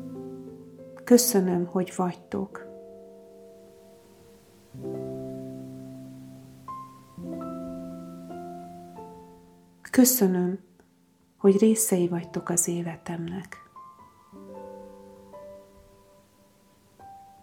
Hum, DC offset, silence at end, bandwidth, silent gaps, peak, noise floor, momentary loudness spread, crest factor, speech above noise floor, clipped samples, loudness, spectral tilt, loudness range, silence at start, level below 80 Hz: none; under 0.1%; 0.2 s; 18 kHz; none; -6 dBFS; -63 dBFS; 27 LU; 24 dB; 39 dB; under 0.1%; -25 LUFS; -5 dB/octave; 17 LU; 0 s; -66 dBFS